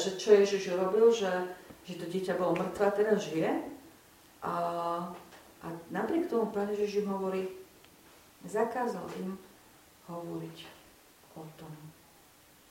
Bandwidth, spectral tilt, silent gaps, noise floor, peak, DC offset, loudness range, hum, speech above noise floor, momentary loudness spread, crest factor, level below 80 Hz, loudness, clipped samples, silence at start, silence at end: 16.5 kHz; -5.5 dB/octave; none; -60 dBFS; -10 dBFS; under 0.1%; 12 LU; none; 29 dB; 23 LU; 22 dB; -72 dBFS; -31 LUFS; under 0.1%; 0 s; 0.8 s